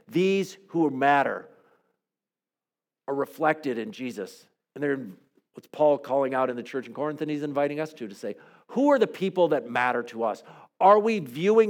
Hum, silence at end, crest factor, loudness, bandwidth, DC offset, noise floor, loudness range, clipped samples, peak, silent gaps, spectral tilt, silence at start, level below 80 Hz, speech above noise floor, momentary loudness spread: none; 0 s; 20 dB; -26 LUFS; 17 kHz; under 0.1%; under -90 dBFS; 7 LU; under 0.1%; -6 dBFS; none; -6 dB/octave; 0.1 s; -90 dBFS; over 65 dB; 15 LU